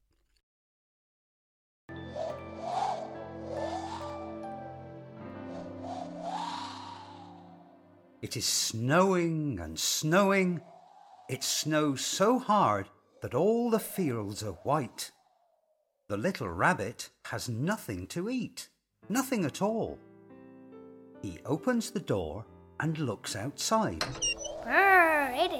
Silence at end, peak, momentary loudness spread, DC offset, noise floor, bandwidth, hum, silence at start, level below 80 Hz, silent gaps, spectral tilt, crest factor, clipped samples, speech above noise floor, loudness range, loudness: 0 s; -10 dBFS; 19 LU; under 0.1%; -75 dBFS; 17 kHz; none; 1.9 s; -62 dBFS; none; -4 dB/octave; 22 dB; under 0.1%; 46 dB; 11 LU; -30 LUFS